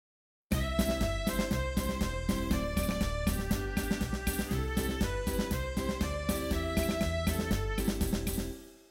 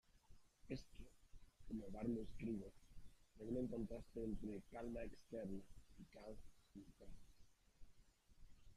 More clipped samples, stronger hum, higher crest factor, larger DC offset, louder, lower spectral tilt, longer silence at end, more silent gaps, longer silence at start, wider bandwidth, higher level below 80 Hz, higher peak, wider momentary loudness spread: neither; neither; about the same, 16 dB vs 18 dB; neither; first, -33 LUFS vs -51 LUFS; second, -5 dB/octave vs -7.5 dB/octave; first, 0.15 s vs 0 s; neither; first, 0.5 s vs 0.1 s; first, 17 kHz vs 14 kHz; first, -38 dBFS vs -62 dBFS; first, -16 dBFS vs -34 dBFS; second, 3 LU vs 19 LU